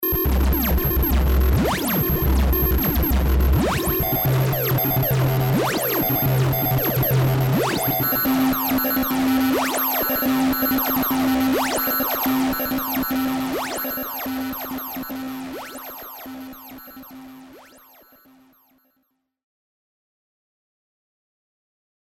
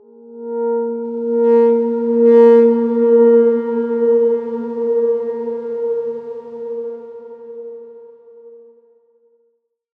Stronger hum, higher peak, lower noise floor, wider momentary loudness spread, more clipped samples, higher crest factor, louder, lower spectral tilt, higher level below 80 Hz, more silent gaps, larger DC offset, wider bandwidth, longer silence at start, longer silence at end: neither; second, -10 dBFS vs -2 dBFS; first, -71 dBFS vs -65 dBFS; second, 13 LU vs 22 LU; neither; about the same, 12 dB vs 16 dB; second, -20 LUFS vs -15 LUFS; second, -5.5 dB/octave vs -9.5 dB/octave; first, -28 dBFS vs -76 dBFS; neither; neither; first, over 20 kHz vs 3.2 kHz; second, 0 s vs 0.3 s; first, 4.45 s vs 1.4 s